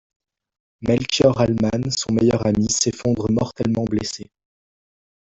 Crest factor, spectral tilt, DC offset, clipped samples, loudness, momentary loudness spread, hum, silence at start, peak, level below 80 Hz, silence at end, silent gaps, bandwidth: 18 dB; -5 dB/octave; under 0.1%; under 0.1%; -20 LUFS; 7 LU; none; 0.8 s; -2 dBFS; -46 dBFS; 1.05 s; none; 8.4 kHz